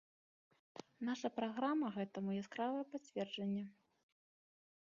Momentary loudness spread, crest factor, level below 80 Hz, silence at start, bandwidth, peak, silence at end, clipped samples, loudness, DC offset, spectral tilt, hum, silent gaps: 14 LU; 18 dB; -88 dBFS; 0.75 s; 7.4 kHz; -26 dBFS; 1.15 s; under 0.1%; -42 LUFS; under 0.1%; -5 dB/octave; none; none